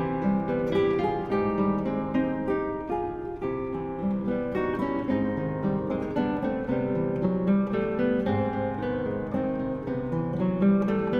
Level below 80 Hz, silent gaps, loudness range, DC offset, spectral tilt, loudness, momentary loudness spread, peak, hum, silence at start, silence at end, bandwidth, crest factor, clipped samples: -48 dBFS; none; 2 LU; under 0.1%; -9.5 dB/octave; -27 LUFS; 6 LU; -12 dBFS; none; 0 s; 0 s; 5.6 kHz; 14 dB; under 0.1%